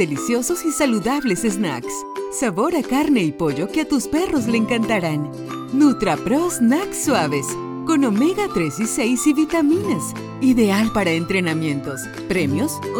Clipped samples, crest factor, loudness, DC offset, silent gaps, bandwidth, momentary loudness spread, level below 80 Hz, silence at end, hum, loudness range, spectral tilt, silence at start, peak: under 0.1%; 14 dB; -20 LUFS; under 0.1%; none; 19 kHz; 8 LU; -48 dBFS; 0 s; none; 2 LU; -5 dB/octave; 0 s; -4 dBFS